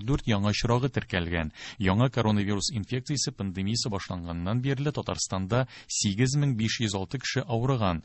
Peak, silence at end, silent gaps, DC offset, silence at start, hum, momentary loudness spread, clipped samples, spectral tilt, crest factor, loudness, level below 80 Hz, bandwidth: -10 dBFS; 0.05 s; none; under 0.1%; 0 s; none; 6 LU; under 0.1%; -5 dB/octave; 18 dB; -28 LUFS; -44 dBFS; 8.6 kHz